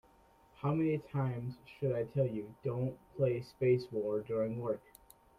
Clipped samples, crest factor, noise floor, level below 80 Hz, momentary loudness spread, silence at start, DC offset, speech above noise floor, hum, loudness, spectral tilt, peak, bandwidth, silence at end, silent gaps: under 0.1%; 18 dB; -65 dBFS; -66 dBFS; 8 LU; 0.6 s; under 0.1%; 30 dB; none; -36 LUFS; -9 dB/octave; -18 dBFS; 15 kHz; 0.6 s; none